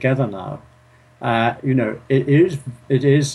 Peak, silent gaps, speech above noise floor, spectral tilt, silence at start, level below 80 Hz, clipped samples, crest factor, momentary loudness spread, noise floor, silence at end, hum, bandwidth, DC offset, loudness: -4 dBFS; none; 33 dB; -7 dB/octave; 0 s; -54 dBFS; under 0.1%; 14 dB; 15 LU; -51 dBFS; 0 s; none; 11.5 kHz; under 0.1%; -19 LUFS